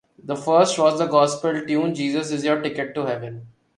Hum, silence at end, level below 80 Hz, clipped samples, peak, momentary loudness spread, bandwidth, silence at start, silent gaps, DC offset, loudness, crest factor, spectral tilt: none; 0.3 s; -66 dBFS; under 0.1%; -4 dBFS; 12 LU; 11.5 kHz; 0.25 s; none; under 0.1%; -21 LUFS; 18 dB; -5 dB/octave